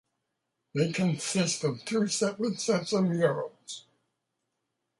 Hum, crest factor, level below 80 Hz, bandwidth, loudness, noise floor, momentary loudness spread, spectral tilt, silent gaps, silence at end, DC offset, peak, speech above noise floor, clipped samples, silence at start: none; 18 dB; -72 dBFS; 11.5 kHz; -29 LUFS; -82 dBFS; 12 LU; -4.5 dB/octave; none; 1.2 s; under 0.1%; -12 dBFS; 54 dB; under 0.1%; 0.75 s